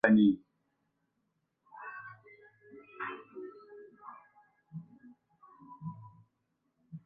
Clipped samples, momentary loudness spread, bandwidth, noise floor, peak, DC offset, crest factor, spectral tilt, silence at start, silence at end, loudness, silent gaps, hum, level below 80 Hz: under 0.1%; 26 LU; 3.8 kHz; -81 dBFS; -12 dBFS; under 0.1%; 24 dB; -6 dB/octave; 0.05 s; 0.05 s; -33 LUFS; none; none; -76 dBFS